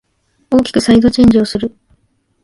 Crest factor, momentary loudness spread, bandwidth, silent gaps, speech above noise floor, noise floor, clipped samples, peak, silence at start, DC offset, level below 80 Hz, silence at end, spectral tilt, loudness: 12 dB; 11 LU; 11.5 kHz; none; 47 dB; -58 dBFS; under 0.1%; 0 dBFS; 0.5 s; under 0.1%; -36 dBFS; 0.75 s; -6 dB/octave; -11 LUFS